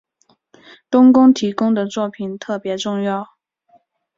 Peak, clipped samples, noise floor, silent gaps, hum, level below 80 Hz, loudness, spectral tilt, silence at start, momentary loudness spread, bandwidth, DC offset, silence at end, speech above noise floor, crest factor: -2 dBFS; under 0.1%; -61 dBFS; none; none; -62 dBFS; -16 LUFS; -6 dB/octave; 0.9 s; 15 LU; 7.6 kHz; under 0.1%; 0.9 s; 45 dB; 16 dB